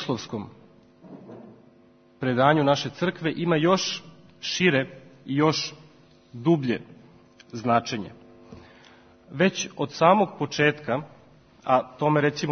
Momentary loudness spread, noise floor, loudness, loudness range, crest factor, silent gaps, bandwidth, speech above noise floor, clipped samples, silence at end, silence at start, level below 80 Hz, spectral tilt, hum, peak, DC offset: 17 LU; -56 dBFS; -24 LUFS; 5 LU; 22 dB; none; 6.6 kHz; 32 dB; under 0.1%; 0 s; 0 s; -66 dBFS; -5 dB/octave; none; -4 dBFS; under 0.1%